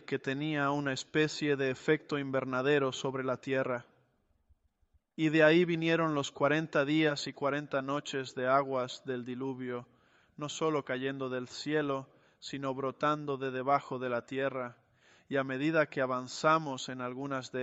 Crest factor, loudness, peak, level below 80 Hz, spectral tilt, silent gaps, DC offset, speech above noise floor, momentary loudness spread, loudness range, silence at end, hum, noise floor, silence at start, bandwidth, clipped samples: 20 dB; -32 LUFS; -12 dBFS; -76 dBFS; -5.5 dB/octave; none; under 0.1%; 41 dB; 10 LU; 6 LU; 0 s; none; -73 dBFS; 0.1 s; 8.2 kHz; under 0.1%